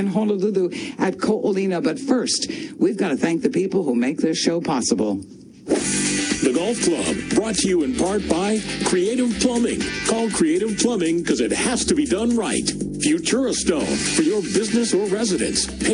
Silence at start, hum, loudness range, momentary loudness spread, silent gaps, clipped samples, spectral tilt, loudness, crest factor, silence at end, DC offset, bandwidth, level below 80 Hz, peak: 0 s; none; 1 LU; 3 LU; none; under 0.1%; -4 dB/octave; -21 LUFS; 16 dB; 0 s; under 0.1%; 10.5 kHz; -46 dBFS; -4 dBFS